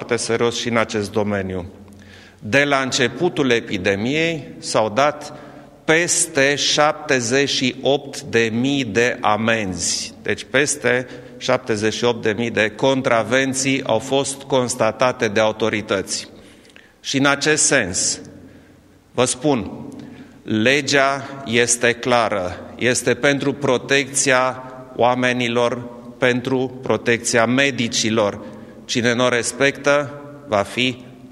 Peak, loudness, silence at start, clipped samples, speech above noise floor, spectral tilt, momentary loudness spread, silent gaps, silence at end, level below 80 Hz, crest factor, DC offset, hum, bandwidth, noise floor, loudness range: 0 dBFS; -18 LUFS; 0 s; under 0.1%; 30 dB; -3 dB/octave; 12 LU; none; 0 s; -54 dBFS; 20 dB; under 0.1%; none; 14 kHz; -49 dBFS; 2 LU